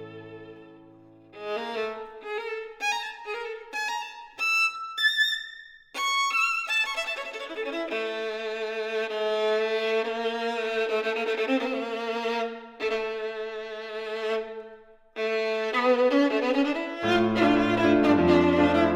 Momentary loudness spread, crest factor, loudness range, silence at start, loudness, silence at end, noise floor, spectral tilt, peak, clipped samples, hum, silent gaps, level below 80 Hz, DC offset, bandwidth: 13 LU; 18 dB; 9 LU; 0 s; -26 LUFS; 0 s; -52 dBFS; -4.5 dB/octave; -10 dBFS; under 0.1%; none; none; -58 dBFS; under 0.1%; 16 kHz